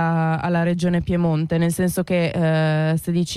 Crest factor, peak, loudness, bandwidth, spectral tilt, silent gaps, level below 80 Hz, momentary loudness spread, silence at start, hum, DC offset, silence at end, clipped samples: 10 dB; -10 dBFS; -20 LUFS; 13.5 kHz; -6.5 dB/octave; none; -44 dBFS; 2 LU; 0 s; none; under 0.1%; 0 s; under 0.1%